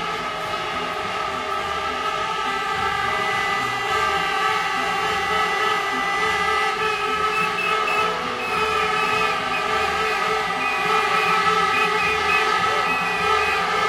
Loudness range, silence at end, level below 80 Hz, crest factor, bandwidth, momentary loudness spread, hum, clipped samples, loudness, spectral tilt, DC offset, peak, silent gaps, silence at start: 3 LU; 0 s; -50 dBFS; 16 dB; 16.5 kHz; 6 LU; none; under 0.1%; -20 LUFS; -2.5 dB/octave; under 0.1%; -6 dBFS; none; 0 s